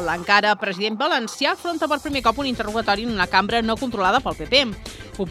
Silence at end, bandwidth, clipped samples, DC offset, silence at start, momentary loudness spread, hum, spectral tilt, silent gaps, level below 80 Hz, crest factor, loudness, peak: 0 s; 15.5 kHz; under 0.1%; under 0.1%; 0 s; 7 LU; none; -3.5 dB/octave; none; -42 dBFS; 20 dB; -21 LUFS; 0 dBFS